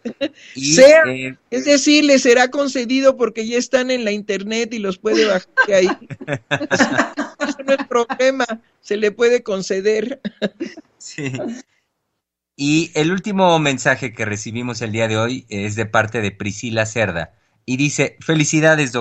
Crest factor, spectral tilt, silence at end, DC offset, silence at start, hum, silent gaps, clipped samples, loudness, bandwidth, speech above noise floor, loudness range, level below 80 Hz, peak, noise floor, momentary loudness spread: 18 dB; -4 dB/octave; 0 s; under 0.1%; 0.05 s; none; none; under 0.1%; -17 LUFS; 9.4 kHz; 60 dB; 8 LU; -56 dBFS; 0 dBFS; -77 dBFS; 14 LU